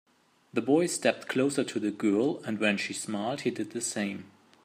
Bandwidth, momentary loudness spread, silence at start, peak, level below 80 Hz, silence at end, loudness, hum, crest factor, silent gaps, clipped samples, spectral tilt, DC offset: 15.5 kHz; 7 LU; 0.55 s; -8 dBFS; -78 dBFS; 0.35 s; -29 LUFS; none; 22 dB; none; under 0.1%; -4 dB/octave; under 0.1%